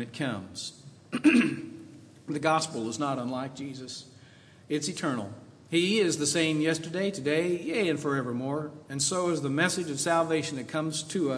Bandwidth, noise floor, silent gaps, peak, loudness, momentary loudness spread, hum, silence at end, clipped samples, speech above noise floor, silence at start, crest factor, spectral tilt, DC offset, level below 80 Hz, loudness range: 11 kHz; -54 dBFS; none; -10 dBFS; -28 LUFS; 14 LU; none; 0 s; under 0.1%; 25 dB; 0 s; 20 dB; -4 dB/octave; under 0.1%; -74 dBFS; 5 LU